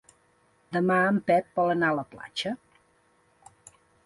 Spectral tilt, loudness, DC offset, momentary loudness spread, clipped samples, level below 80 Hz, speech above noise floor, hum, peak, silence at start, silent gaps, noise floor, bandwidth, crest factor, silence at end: -6 dB/octave; -26 LUFS; under 0.1%; 11 LU; under 0.1%; -68 dBFS; 40 dB; none; -12 dBFS; 0.7 s; none; -65 dBFS; 11.5 kHz; 16 dB; 1.5 s